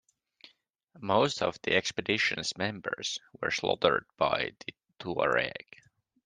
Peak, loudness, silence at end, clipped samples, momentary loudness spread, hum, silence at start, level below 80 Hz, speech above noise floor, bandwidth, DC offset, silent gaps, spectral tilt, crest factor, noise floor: -8 dBFS; -30 LUFS; 0.65 s; under 0.1%; 10 LU; none; 0.95 s; -66 dBFS; 34 dB; 10 kHz; under 0.1%; none; -3.5 dB/octave; 24 dB; -65 dBFS